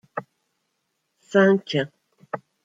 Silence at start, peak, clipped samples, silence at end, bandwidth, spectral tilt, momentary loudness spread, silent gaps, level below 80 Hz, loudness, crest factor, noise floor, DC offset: 0.15 s; -6 dBFS; under 0.1%; 0.25 s; 7.8 kHz; -6.5 dB/octave; 18 LU; none; -72 dBFS; -21 LUFS; 20 dB; -75 dBFS; under 0.1%